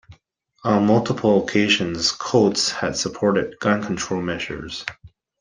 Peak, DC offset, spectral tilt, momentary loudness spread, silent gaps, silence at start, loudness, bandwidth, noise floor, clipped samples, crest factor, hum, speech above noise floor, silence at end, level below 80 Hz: -4 dBFS; under 0.1%; -4.5 dB/octave; 11 LU; none; 0.1 s; -20 LUFS; 9.8 kHz; -59 dBFS; under 0.1%; 18 dB; none; 39 dB; 0.35 s; -52 dBFS